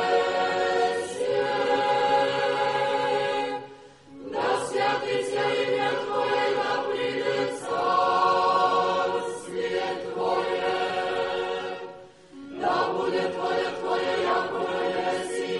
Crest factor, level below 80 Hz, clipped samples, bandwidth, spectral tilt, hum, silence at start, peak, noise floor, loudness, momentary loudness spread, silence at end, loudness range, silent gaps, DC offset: 16 dB; -66 dBFS; under 0.1%; 11.5 kHz; -4 dB/octave; none; 0 s; -10 dBFS; -47 dBFS; -25 LUFS; 8 LU; 0 s; 4 LU; none; under 0.1%